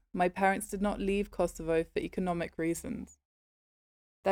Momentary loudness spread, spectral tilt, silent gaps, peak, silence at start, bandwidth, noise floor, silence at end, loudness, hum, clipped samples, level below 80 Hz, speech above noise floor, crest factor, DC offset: 8 LU; -5.5 dB/octave; 3.25-4.23 s; -16 dBFS; 0.15 s; 18 kHz; under -90 dBFS; 0 s; -33 LUFS; none; under 0.1%; -52 dBFS; over 58 dB; 18 dB; under 0.1%